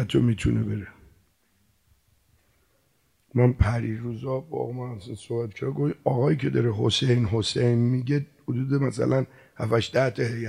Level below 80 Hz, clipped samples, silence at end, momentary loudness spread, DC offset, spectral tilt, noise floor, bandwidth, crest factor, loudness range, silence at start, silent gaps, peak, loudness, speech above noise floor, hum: -42 dBFS; under 0.1%; 0 s; 10 LU; under 0.1%; -6.5 dB/octave; -68 dBFS; 10.5 kHz; 18 dB; 6 LU; 0 s; none; -8 dBFS; -25 LUFS; 43 dB; none